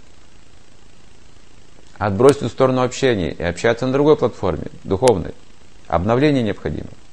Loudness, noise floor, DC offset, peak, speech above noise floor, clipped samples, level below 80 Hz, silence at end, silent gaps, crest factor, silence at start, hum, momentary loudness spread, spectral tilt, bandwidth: -18 LUFS; -49 dBFS; 2%; 0 dBFS; 31 dB; under 0.1%; -40 dBFS; 0.2 s; none; 20 dB; 2 s; none; 11 LU; -6 dB/octave; 11.5 kHz